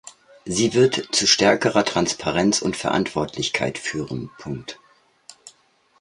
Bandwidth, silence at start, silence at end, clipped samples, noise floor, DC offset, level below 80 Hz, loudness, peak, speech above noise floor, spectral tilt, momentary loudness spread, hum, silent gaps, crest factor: 11.5 kHz; 0.05 s; 0.5 s; under 0.1%; -60 dBFS; under 0.1%; -52 dBFS; -20 LUFS; -2 dBFS; 39 dB; -3.5 dB/octave; 16 LU; none; none; 20 dB